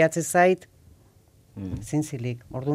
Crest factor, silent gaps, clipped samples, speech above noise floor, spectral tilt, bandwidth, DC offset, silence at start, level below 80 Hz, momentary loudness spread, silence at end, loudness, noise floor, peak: 20 dB; none; under 0.1%; 33 dB; -5.5 dB/octave; 16 kHz; under 0.1%; 0 s; -54 dBFS; 16 LU; 0 s; -25 LUFS; -57 dBFS; -6 dBFS